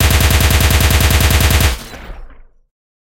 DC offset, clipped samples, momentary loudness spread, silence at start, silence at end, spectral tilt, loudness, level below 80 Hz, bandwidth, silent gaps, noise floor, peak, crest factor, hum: under 0.1%; under 0.1%; 15 LU; 0 s; 0.8 s; -3.5 dB/octave; -12 LUFS; -18 dBFS; 17.5 kHz; none; -36 dBFS; 0 dBFS; 12 dB; none